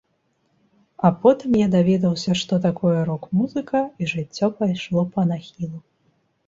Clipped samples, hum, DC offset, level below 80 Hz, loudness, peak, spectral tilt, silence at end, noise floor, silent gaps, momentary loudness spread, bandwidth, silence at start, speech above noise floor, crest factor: under 0.1%; none; under 0.1%; -56 dBFS; -21 LUFS; -2 dBFS; -7 dB/octave; 0.7 s; -68 dBFS; none; 9 LU; 7.8 kHz; 1 s; 48 dB; 18 dB